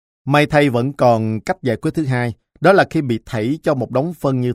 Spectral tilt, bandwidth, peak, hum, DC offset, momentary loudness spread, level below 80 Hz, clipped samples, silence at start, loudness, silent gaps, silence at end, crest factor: -7 dB/octave; 15 kHz; 0 dBFS; none; under 0.1%; 8 LU; -48 dBFS; under 0.1%; 0.25 s; -17 LUFS; none; 0 s; 16 dB